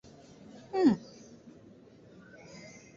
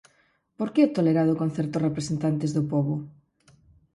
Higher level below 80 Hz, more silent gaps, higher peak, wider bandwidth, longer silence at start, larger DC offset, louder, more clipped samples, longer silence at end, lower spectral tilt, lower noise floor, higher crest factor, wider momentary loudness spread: second, -70 dBFS vs -62 dBFS; neither; second, -14 dBFS vs -8 dBFS; second, 7.6 kHz vs 11.5 kHz; first, 0.75 s vs 0.6 s; neither; second, -29 LUFS vs -25 LUFS; neither; second, 0.3 s vs 0.85 s; about the same, -6.5 dB/octave vs -7.5 dB/octave; second, -55 dBFS vs -66 dBFS; about the same, 22 dB vs 18 dB; first, 27 LU vs 9 LU